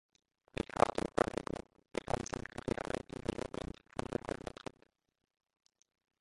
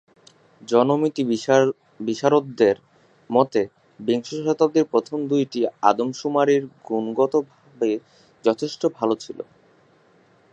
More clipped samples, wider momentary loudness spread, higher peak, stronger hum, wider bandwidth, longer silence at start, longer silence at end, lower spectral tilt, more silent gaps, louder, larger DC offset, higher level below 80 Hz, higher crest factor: neither; about the same, 13 LU vs 11 LU; second, -10 dBFS vs -2 dBFS; neither; first, 11.5 kHz vs 8.6 kHz; about the same, 0.6 s vs 0.7 s; first, 1.9 s vs 1.1 s; about the same, -5 dB/octave vs -6 dB/octave; neither; second, -39 LUFS vs -22 LUFS; neither; first, -58 dBFS vs -70 dBFS; first, 32 dB vs 20 dB